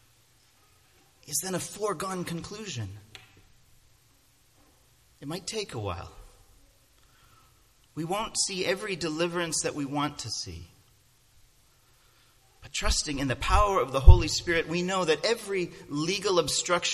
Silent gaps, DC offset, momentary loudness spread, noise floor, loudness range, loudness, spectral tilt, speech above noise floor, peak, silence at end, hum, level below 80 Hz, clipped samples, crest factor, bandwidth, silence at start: none; under 0.1%; 15 LU; -63 dBFS; 15 LU; -28 LUFS; -4 dB/octave; 37 dB; 0 dBFS; 0 s; none; -34 dBFS; under 0.1%; 28 dB; 14 kHz; 1.3 s